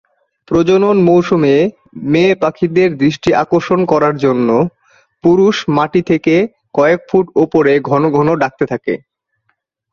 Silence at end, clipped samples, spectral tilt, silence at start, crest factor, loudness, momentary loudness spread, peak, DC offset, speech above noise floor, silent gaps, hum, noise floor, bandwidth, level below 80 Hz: 0.95 s; under 0.1%; -7 dB/octave; 0.5 s; 12 dB; -13 LUFS; 7 LU; 0 dBFS; under 0.1%; 54 dB; none; none; -66 dBFS; 7.2 kHz; -48 dBFS